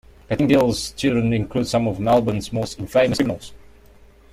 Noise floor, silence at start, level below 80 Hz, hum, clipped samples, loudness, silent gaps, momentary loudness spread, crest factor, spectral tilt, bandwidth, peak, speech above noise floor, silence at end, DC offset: -48 dBFS; 0.3 s; -44 dBFS; none; under 0.1%; -20 LUFS; none; 9 LU; 16 dB; -6 dB/octave; 16 kHz; -4 dBFS; 29 dB; 0.75 s; under 0.1%